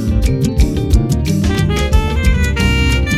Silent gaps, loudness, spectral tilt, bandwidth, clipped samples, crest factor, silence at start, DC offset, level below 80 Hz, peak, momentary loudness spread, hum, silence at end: none; -15 LUFS; -6 dB/octave; 14.5 kHz; under 0.1%; 12 dB; 0 s; under 0.1%; -16 dBFS; 0 dBFS; 2 LU; none; 0 s